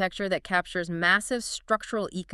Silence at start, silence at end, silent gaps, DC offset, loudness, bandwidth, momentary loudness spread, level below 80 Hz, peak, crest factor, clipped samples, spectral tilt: 0 s; 0 s; none; under 0.1%; -27 LUFS; 13.5 kHz; 9 LU; -56 dBFS; -8 dBFS; 20 dB; under 0.1%; -3.5 dB/octave